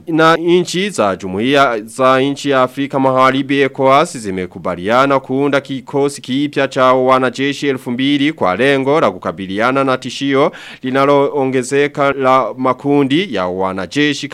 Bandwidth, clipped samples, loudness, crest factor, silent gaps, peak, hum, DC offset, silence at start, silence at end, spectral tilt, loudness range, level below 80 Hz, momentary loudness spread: 13.5 kHz; under 0.1%; -14 LUFS; 14 dB; none; 0 dBFS; none; under 0.1%; 0.05 s; 0 s; -5 dB/octave; 2 LU; -56 dBFS; 7 LU